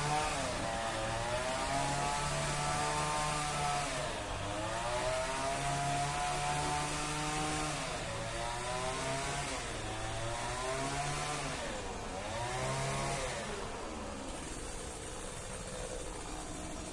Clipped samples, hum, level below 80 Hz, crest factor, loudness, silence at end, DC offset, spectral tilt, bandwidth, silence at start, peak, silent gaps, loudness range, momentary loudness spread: under 0.1%; none; -48 dBFS; 16 dB; -36 LUFS; 0 s; under 0.1%; -3.5 dB/octave; 11.5 kHz; 0 s; -20 dBFS; none; 5 LU; 9 LU